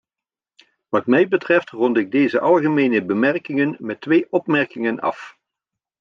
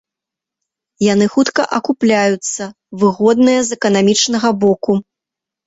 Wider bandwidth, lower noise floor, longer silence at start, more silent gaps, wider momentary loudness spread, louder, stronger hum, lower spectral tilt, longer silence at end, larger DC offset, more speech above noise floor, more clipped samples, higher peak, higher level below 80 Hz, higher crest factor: second, 7 kHz vs 8 kHz; first, -89 dBFS vs -84 dBFS; about the same, 0.9 s vs 1 s; neither; about the same, 7 LU vs 7 LU; second, -19 LUFS vs -14 LUFS; neither; first, -8 dB/octave vs -4 dB/octave; about the same, 0.7 s vs 0.65 s; neither; about the same, 71 dB vs 71 dB; neither; second, -4 dBFS vs 0 dBFS; second, -70 dBFS vs -56 dBFS; about the same, 16 dB vs 14 dB